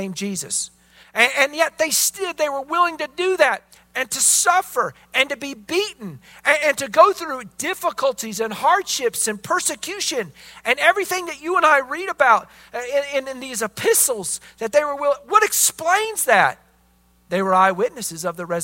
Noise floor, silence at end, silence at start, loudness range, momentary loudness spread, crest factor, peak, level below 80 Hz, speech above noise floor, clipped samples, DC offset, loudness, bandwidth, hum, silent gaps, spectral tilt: -58 dBFS; 0 s; 0 s; 2 LU; 11 LU; 20 dB; 0 dBFS; -62 dBFS; 38 dB; under 0.1%; under 0.1%; -19 LUFS; 16.5 kHz; none; none; -1.5 dB/octave